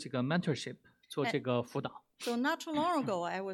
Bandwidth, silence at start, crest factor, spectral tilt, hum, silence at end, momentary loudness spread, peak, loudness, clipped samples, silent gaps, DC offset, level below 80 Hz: 17 kHz; 0 s; 18 dB; -5.5 dB/octave; none; 0 s; 10 LU; -18 dBFS; -35 LUFS; under 0.1%; none; under 0.1%; -80 dBFS